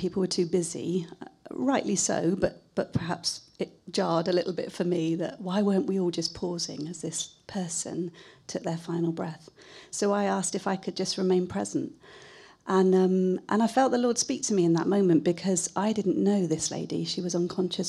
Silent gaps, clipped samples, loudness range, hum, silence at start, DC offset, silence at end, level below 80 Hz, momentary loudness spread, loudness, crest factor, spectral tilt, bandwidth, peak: none; under 0.1%; 7 LU; none; 0 s; under 0.1%; 0 s; -64 dBFS; 11 LU; -28 LUFS; 18 dB; -5 dB/octave; 12.5 kHz; -10 dBFS